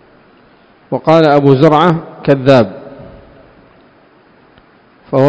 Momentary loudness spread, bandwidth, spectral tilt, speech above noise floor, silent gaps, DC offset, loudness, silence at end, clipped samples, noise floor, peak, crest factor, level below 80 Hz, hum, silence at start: 13 LU; 8 kHz; -8 dB/octave; 37 dB; none; under 0.1%; -10 LUFS; 0 s; 1%; -46 dBFS; 0 dBFS; 14 dB; -48 dBFS; none; 0.9 s